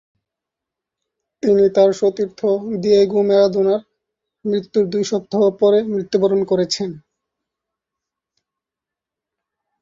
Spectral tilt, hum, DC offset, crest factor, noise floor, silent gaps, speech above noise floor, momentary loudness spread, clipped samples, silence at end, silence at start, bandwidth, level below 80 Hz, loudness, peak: -6 dB/octave; none; under 0.1%; 16 dB; -86 dBFS; none; 70 dB; 9 LU; under 0.1%; 2.85 s; 1.45 s; 7.6 kHz; -62 dBFS; -17 LUFS; -2 dBFS